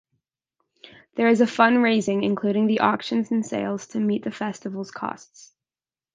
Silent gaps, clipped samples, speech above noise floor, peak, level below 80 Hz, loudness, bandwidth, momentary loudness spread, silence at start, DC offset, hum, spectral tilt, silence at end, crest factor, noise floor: none; under 0.1%; over 68 dB; -2 dBFS; -70 dBFS; -23 LUFS; 9.4 kHz; 15 LU; 1.15 s; under 0.1%; none; -5.5 dB/octave; 1 s; 22 dB; under -90 dBFS